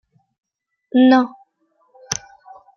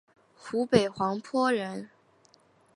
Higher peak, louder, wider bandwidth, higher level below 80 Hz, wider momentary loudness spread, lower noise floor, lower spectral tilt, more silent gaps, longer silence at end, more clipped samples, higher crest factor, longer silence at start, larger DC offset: first, -2 dBFS vs -6 dBFS; first, -17 LUFS vs -28 LUFS; second, 7.2 kHz vs 11.5 kHz; about the same, -64 dBFS vs -64 dBFS; second, 14 LU vs 19 LU; about the same, -64 dBFS vs -63 dBFS; second, -3.5 dB/octave vs -5.5 dB/octave; neither; second, 0.65 s vs 0.9 s; neither; about the same, 20 dB vs 24 dB; first, 0.95 s vs 0.45 s; neither